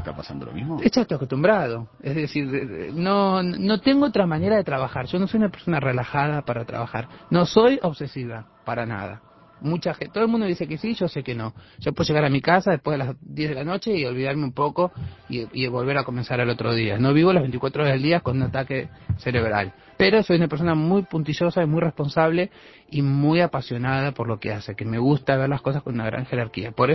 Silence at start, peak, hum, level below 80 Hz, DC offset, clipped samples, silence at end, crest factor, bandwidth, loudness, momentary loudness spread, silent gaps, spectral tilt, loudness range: 0 s; -4 dBFS; none; -48 dBFS; under 0.1%; under 0.1%; 0 s; 20 dB; 6 kHz; -23 LUFS; 11 LU; none; -7.5 dB/octave; 4 LU